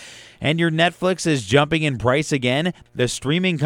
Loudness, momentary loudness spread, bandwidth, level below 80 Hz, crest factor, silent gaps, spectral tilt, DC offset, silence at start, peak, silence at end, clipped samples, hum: -20 LUFS; 6 LU; 15 kHz; -48 dBFS; 18 dB; none; -5 dB/octave; under 0.1%; 0 s; -2 dBFS; 0 s; under 0.1%; none